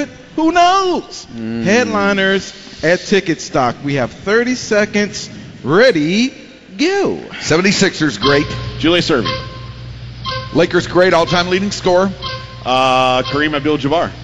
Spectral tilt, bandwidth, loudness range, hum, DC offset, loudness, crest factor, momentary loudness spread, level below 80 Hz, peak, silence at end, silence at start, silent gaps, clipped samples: -4.5 dB/octave; 9 kHz; 2 LU; none; under 0.1%; -15 LUFS; 14 dB; 13 LU; -40 dBFS; 0 dBFS; 0 s; 0 s; none; under 0.1%